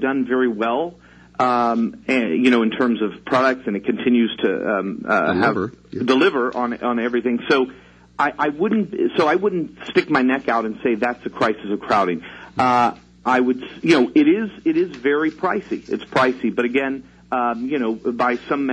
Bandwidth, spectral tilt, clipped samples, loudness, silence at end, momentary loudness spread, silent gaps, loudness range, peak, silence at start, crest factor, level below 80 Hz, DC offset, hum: 9.6 kHz; -6 dB/octave; under 0.1%; -20 LUFS; 0 s; 8 LU; none; 2 LU; -2 dBFS; 0 s; 18 dB; -58 dBFS; under 0.1%; none